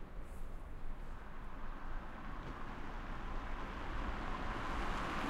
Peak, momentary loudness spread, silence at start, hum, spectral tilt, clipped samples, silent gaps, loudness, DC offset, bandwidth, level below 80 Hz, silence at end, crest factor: -28 dBFS; 11 LU; 0 s; none; -5.5 dB/octave; under 0.1%; none; -46 LUFS; under 0.1%; 10.5 kHz; -44 dBFS; 0 s; 14 dB